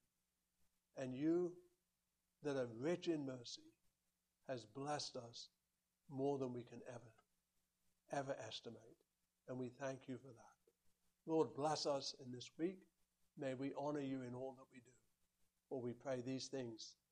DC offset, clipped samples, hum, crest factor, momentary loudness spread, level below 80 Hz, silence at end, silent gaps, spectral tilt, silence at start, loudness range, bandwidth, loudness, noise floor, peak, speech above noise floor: under 0.1%; under 0.1%; none; 22 dB; 19 LU; -86 dBFS; 0.2 s; none; -5 dB/octave; 0.95 s; 6 LU; 11 kHz; -47 LUFS; -90 dBFS; -26 dBFS; 43 dB